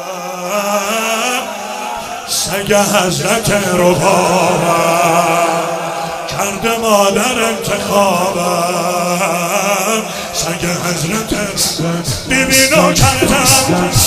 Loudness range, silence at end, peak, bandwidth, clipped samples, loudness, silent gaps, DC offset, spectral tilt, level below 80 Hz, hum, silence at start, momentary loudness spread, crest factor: 3 LU; 0 s; 0 dBFS; 16.5 kHz; under 0.1%; -13 LUFS; none; under 0.1%; -3 dB/octave; -36 dBFS; none; 0 s; 10 LU; 14 dB